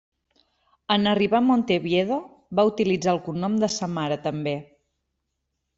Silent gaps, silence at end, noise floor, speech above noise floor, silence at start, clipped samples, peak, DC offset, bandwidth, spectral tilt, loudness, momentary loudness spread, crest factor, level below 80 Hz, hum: none; 1.15 s; -79 dBFS; 56 dB; 0.9 s; under 0.1%; -6 dBFS; under 0.1%; 7.8 kHz; -5.5 dB/octave; -23 LUFS; 9 LU; 18 dB; -62 dBFS; none